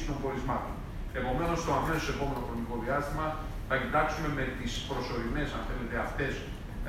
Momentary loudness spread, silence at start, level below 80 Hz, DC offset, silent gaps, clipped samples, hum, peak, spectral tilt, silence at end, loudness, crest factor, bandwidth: 7 LU; 0 s; -40 dBFS; under 0.1%; none; under 0.1%; none; -14 dBFS; -5.5 dB/octave; 0 s; -33 LUFS; 18 dB; 16 kHz